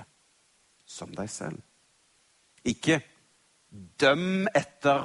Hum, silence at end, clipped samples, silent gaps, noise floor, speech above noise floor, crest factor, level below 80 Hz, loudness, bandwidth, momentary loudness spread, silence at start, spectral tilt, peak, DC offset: none; 0 s; under 0.1%; none; -66 dBFS; 39 dB; 22 dB; -64 dBFS; -27 LUFS; 11.5 kHz; 22 LU; 0 s; -4.5 dB/octave; -10 dBFS; under 0.1%